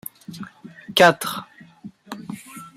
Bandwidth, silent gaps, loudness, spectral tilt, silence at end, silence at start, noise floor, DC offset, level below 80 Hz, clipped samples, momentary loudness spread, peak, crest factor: 16 kHz; none; -18 LUFS; -3.5 dB/octave; 0.1 s; 0.3 s; -43 dBFS; under 0.1%; -68 dBFS; under 0.1%; 23 LU; -2 dBFS; 22 dB